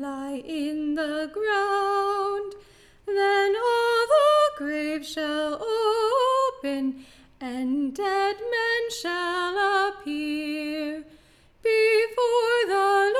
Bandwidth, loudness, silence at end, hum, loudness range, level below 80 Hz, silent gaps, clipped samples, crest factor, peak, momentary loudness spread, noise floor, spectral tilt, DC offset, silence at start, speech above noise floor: 15 kHz; -24 LUFS; 0 s; none; 4 LU; -62 dBFS; none; under 0.1%; 14 dB; -10 dBFS; 11 LU; -55 dBFS; -2.5 dB/octave; under 0.1%; 0 s; 29 dB